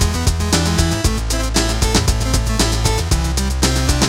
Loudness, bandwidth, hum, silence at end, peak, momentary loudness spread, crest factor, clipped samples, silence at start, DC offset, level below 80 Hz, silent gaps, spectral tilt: -17 LUFS; 16.5 kHz; none; 0 s; -2 dBFS; 3 LU; 14 dB; under 0.1%; 0 s; under 0.1%; -20 dBFS; none; -4 dB/octave